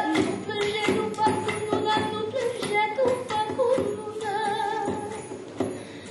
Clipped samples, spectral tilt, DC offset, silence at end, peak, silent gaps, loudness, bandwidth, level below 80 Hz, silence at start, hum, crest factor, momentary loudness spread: under 0.1%; -4.5 dB/octave; under 0.1%; 0 s; -8 dBFS; none; -26 LUFS; 11.5 kHz; -62 dBFS; 0 s; none; 18 dB; 8 LU